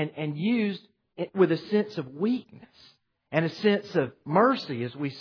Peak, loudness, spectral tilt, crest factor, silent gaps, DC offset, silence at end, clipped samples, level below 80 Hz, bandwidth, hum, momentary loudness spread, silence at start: -8 dBFS; -27 LUFS; -8 dB/octave; 20 dB; none; under 0.1%; 0 s; under 0.1%; -76 dBFS; 5.4 kHz; none; 10 LU; 0 s